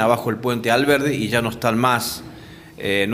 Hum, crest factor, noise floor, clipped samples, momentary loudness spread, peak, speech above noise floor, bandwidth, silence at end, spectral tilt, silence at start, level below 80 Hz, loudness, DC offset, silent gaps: none; 18 dB; -40 dBFS; under 0.1%; 13 LU; -2 dBFS; 21 dB; 16 kHz; 0 s; -4.5 dB/octave; 0 s; -52 dBFS; -20 LUFS; under 0.1%; none